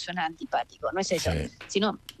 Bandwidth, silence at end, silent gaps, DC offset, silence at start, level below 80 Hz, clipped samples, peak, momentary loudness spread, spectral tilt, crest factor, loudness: 13 kHz; 0.1 s; none; under 0.1%; 0 s; -48 dBFS; under 0.1%; -10 dBFS; 4 LU; -4 dB/octave; 18 dB; -29 LUFS